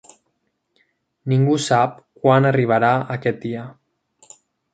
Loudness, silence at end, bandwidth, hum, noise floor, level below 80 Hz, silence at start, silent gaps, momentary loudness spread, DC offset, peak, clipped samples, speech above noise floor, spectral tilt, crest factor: -18 LUFS; 1 s; 9.2 kHz; none; -71 dBFS; -62 dBFS; 1.25 s; none; 14 LU; under 0.1%; -2 dBFS; under 0.1%; 54 dB; -6.5 dB/octave; 18 dB